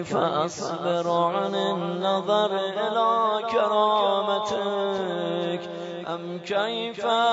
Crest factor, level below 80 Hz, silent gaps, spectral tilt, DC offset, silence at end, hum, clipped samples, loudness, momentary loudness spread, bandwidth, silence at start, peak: 14 dB; -70 dBFS; none; -5 dB/octave; under 0.1%; 0 s; none; under 0.1%; -25 LUFS; 8 LU; 8 kHz; 0 s; -10 dBFS